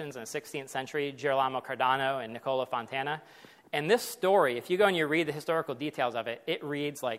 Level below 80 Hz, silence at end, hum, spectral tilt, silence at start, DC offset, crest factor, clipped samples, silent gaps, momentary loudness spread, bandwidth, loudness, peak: -78 dBFS; 0 s; none; -4.5 dB/octave; 0 s; under 0.1%; 20 dB; under 0.1%; none; 10 LU; 16 kHz; -30 LUFS; -10 dBFS